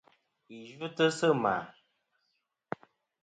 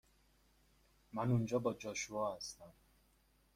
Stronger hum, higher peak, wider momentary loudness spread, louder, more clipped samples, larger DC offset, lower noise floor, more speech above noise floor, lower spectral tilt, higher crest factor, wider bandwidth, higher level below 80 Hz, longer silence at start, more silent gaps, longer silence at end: neither; first, -14 dBFS vs -24 dBFS; first, 22 LU vs 13 LU; first, -30 LUFS vs -40 LUFS; neither; neither; first, -80 dBFS vs -73 dBFS; first, 50 dB vs 34 dB; about the same, -5 dB/octave vs -5.5 dB/octave; about the same, 20 dB vs 20 dB; second, 9.4 kHz vs 15.5 kHz; second, -76 dBFS vs -68 dBFS; second, 0.5 s vs 1.15 s; neither; first, 1.55 s vs 0.85 s